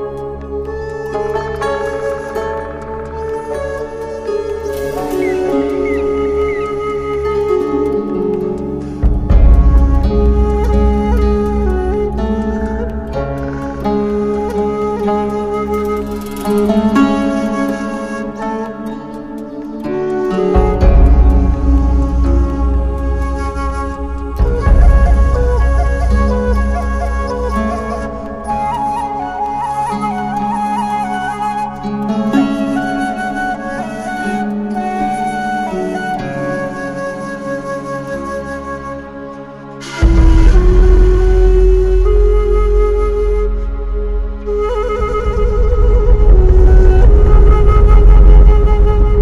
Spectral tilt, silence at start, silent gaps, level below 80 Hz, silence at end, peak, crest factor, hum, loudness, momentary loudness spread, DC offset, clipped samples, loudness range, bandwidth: -8 dB/octave; 0 s; none; -14 dBFS; 0 s; 0 dBFS; 12 dB; none; -15 LUFS; 12 LU; under 0.1%; 0.3%; 8 LU; 11 kHz